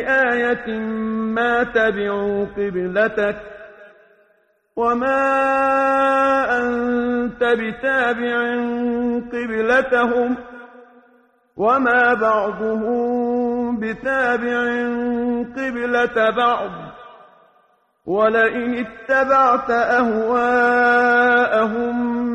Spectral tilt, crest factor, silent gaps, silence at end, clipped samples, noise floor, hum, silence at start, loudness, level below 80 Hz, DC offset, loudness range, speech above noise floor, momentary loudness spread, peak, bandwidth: -6 dB/octave; 14 dB; none; 0 s; under 0.1%; -61 dBFS; none; 0 s; -18 LUFS; -52 dBFS; under 0.1%; 5 LU; 43 dB; 9 LU; -4 dBFS; 9 kHz